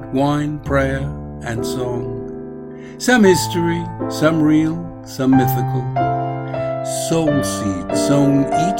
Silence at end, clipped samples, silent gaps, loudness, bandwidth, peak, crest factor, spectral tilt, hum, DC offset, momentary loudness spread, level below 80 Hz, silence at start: 0 s; under 0.1%; none; -18 LUFS; 16.5 kHz; 0 dBFS; 18 dB; -6 dB/octave; none; under 0.1%; 14 LU; -38 dBFS; 0 s